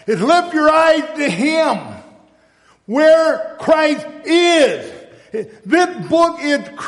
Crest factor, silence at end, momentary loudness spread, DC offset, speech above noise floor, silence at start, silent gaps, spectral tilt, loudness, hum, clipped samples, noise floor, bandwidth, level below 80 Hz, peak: 12 dB; 0 s; 16 LU; under 0.1%; 39 dB; 0.05 s; none; -4 dB/octave; -14 LUFS; none; under 0.1%; -53 dBFS; 11.5 kHz; -56 dBFS; -2 dBFS